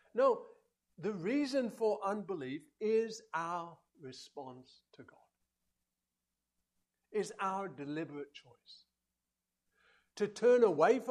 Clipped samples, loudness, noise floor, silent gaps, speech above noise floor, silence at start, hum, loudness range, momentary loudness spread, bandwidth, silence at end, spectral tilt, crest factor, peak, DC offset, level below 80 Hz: under 0.1%; -35 LUFS; -90 dBFS; none; 55 dB; 0.15 s; none; 13 LU; 22 LU; 11.5 kHz; 0 s; -5.5 dB/octave; 20 dB; -16 dBFS; under 0.1%; -84 dBFS